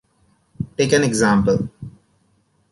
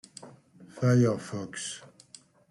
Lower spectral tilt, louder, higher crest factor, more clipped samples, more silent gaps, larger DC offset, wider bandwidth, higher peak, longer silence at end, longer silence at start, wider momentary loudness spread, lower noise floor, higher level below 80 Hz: about the same, -5 dB/octave vs -6 dB/octave; first, -18 LUFS vs -28 LUFS; about the same, 18 dB vs 18 dB; neither; neither; neither; about the same, 11.5 kHz vs 11.5 kHz; first, -4 dBFS vs -12 dBFS; first, 0.8 s vs 0.65 s; first, 0.6 s vs 0.2 s; second, 20 LU vs 24 LU; first, -62 dBFS vs -55 dBFS; first, -46 dBFS vs -68 dBFS